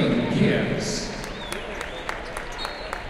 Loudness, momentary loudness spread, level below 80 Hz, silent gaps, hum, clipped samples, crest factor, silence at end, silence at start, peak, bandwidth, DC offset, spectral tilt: -27 LUFS; 11 LU; -40 dBFS; none; none; under 0.1%; 18 dB; 0 s; 0 s; -8 dBFS; 15.5 kHz; under 0.1%; -5 dB/octave